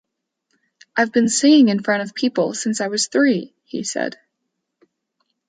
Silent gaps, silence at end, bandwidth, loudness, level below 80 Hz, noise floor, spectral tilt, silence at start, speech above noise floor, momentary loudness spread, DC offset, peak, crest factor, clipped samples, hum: none; 1.4 s; 9.4 kHz; -18 LUFS; -70 dBFS; -77 dBFS; -3.5 dB/octave; 0.95 s; 59 dB; 13 LU; under 0.1%; -4 dBFS; 16 dB; under 0.1%; none